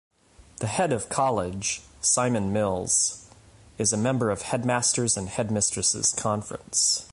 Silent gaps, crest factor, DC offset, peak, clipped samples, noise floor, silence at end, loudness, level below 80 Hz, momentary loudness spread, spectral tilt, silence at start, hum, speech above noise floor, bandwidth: none; 18 dB; under 0.1%; -10 dBFS; under 0.1%; -52 dBFS; 0.05 s; -24 LUFS; -52 dBFS; 7 LU; -3 dB/octave; 0.6 s; none; 27 dB; 11.5 kHz